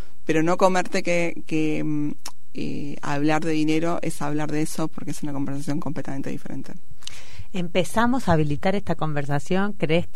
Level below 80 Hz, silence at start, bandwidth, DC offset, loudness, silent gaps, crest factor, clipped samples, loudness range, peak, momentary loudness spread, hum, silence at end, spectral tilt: -48 dBFS; 0.25 s; 16 kHz; 9%; -25 LUFS; none; 22 dB; under 0.1%; 5 LU; -4 dBFS; 14 LU; none; 0.1 s; -6 dB/octave